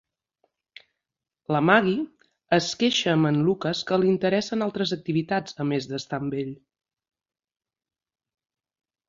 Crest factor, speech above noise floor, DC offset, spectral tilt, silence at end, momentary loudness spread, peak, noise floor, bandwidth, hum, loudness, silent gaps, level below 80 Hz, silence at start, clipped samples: 24 dB; 63 dB; under 0.1%; -5.5 dB/octave; 2.55 s; 10 LU; -4 dBFS; -87 dBFS; 7.8 kHz; none; -24 LUFS; none; -66 dBFS; 1.5 s; under 0.1%